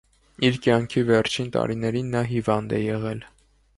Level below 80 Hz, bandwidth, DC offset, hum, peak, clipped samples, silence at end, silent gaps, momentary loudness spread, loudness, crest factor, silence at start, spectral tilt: -52 dBFS; 11.5 kHz; under 0.1%; none; -6 dBFS; under 0.1%; 0.5 s; none; 6 LU; -24 LUFS; 18 dB; 0.4 s; -6 dB/octave